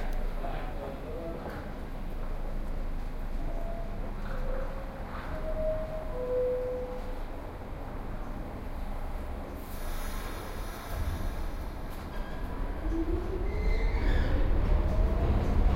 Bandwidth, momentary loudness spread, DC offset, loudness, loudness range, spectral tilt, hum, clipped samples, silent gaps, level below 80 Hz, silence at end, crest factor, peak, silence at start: 16 kHz; 11 LU; under 0.1%; -36 LUFS; 7 LU; -7 dB/octave; none; under 0.1%; none; -32 dBFS; 0 s; 16 dB; -14 dBFS; 0 s